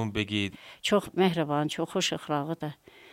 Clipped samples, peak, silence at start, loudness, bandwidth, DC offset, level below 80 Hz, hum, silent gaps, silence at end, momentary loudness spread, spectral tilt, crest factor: under 0.1%; -12 dBFS; 0 s; -29 LUFS; 16 kHz; under 0.1%; -60 dBFS; none; none; 0.05 s; 9 LU; -4.5 dB/octave; 18 dB